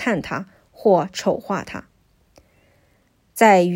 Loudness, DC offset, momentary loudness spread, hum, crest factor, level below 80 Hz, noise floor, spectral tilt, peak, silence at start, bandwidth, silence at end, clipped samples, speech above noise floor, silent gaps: -20 LUFS; under 0.1%; 21 LU; none; 20 dB; -58 dBFS; -61 dBFS; -5.5 dB/octave; 0 dBFS; 0 s; 16 kHz; 0 s; under 0.1%; 43 dB; none